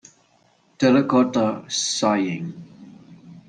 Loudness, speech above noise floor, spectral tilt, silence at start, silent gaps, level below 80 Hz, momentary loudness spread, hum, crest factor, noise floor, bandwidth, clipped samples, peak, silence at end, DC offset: -20 LUFS; 40 dB; -4.5 dB/octave; 0.8 s; none; -64 dBFS; 14 LU; none; 18 dB; -60 dBFS; 10 kHz; under 0.1%; -6 dBFS; 0.1 s; under 0.1%